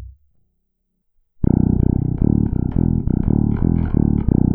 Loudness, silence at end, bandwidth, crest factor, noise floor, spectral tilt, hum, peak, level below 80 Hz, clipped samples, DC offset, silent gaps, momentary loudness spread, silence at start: -18 LUFS; 0 s; 2.5 kHz; 18 dB; -70 dBFS; -15 dB/octave; none; 0 dBFS; -26 dBFS; under 0.1%; under 0.1%; none; 3 LU; 0 s